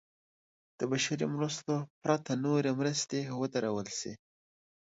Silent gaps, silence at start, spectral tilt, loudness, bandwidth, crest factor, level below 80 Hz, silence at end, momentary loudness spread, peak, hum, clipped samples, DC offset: 1.90-2.01 s; 0.8 s; -4.5 dB/octave; -33 LUFS; 8 kHz; 20 dB; -74 dBFS; 0.8 s; 8 LU; -16 dBFS; none; under 0.1%; under 0.1%